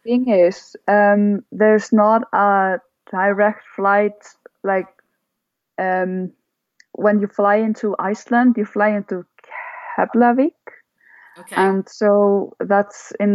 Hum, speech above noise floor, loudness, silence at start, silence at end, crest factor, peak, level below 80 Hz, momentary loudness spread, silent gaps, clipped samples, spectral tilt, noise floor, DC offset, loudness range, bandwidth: none; 61 dB; -18 LUFS; 0.05 s; 0 s; 16 dB; -2 dBFS; -76 dBFS; 13 LU; none; under 0.1%; -7 dB/octave; -77 dBFS; under 0.1%; 6 LU; 11.5 kHz